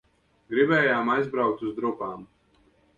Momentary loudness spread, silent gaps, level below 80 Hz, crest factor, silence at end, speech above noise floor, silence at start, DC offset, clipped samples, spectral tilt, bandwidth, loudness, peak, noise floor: 14 LU; none; -64 dBFS; 18 dB; 0.75 s; 38 dB; 0.5 s; under 0.1%; under 0.1%; -7.5 dB/octave; 7.2 kHz; -25 LUFS; -8 dBFS; -63 dBFS